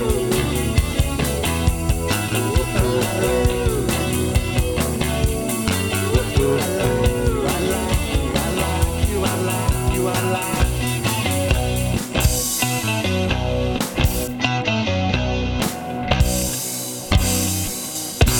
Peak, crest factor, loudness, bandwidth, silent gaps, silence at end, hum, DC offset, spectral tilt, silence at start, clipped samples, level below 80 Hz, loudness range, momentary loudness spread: -2 dBFS; 18 dB; -20 LUFS; 19 kHz; none; 0 s; none; under 0.1%; -4.5 dB/octave; 0 s; under 0.1%; -26 dBFS; 1 LU; 3 LU